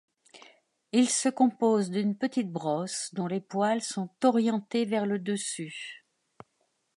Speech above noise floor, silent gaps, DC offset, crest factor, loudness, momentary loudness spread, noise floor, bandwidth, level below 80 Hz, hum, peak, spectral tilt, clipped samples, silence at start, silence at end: 47 dB; none; under 0.1%; 18 dB; -28 LUFS; 9 LU; -75 dBFS; 11.5 kHz; -82 dBFS; none; -10 dBFS; -4.5 dB/octave; under 0.1%; 0.35 s; 1 s